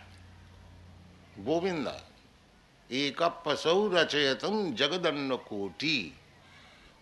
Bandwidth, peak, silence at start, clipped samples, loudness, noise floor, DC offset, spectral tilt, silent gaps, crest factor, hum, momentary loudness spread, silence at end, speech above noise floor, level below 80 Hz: 12 kHz; -12 dBFS; 0 s; under 0.1%; -30 LUFS; -60 dBFS; under 0.1%; -4 dB/octave; none; 20 dB; none; 12 LU; 0.4 s; 30 dB; -64 dBFS